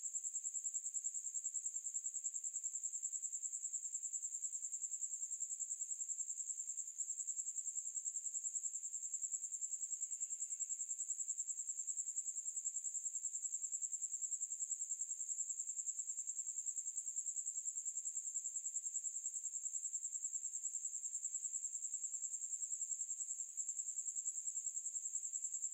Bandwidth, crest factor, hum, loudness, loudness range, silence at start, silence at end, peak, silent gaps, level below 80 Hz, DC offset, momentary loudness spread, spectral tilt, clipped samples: 16 kHz; 16 dB; none; -41 LUFS; 1 LU; 0 s; 0 s; -30 dBFS; none; under -90 dBFS; under 0.1%; 1 LU; 7.5 dB/octave; under 0.1%